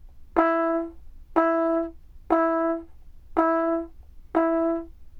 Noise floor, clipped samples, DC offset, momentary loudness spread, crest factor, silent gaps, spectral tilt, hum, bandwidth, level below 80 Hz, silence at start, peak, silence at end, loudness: -44 dBFS; under 0.1%; under 0.1%; 10 LU; 18 dB; none; -8 dB/octave; none; 4.5 kHz; -48 dBFS; 0.05 s; -8 dBFS; 0 s; -25 LUFS